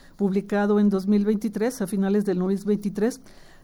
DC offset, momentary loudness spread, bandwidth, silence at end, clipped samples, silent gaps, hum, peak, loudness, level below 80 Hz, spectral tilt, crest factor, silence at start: under 0.1%; 6 LU; 16 kHz; 0.2 s; under 0.1%; none; none; -12 dBFS; -24 LUFS; -54 dBFS; -7.5 dB/octave; 12 dB; 0.2 s